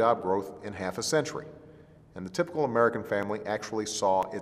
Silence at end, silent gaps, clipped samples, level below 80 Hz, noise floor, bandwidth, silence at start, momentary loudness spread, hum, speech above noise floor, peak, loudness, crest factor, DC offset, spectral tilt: 0 s; none; under 0.1%; -64 dBFS; -53 dBFS; 15 kHz; 0 s; 15 LU; none; 24 dB; -10 dBFS; -29 LUFS; 20 dB; under 0.1%; -4 dB/octave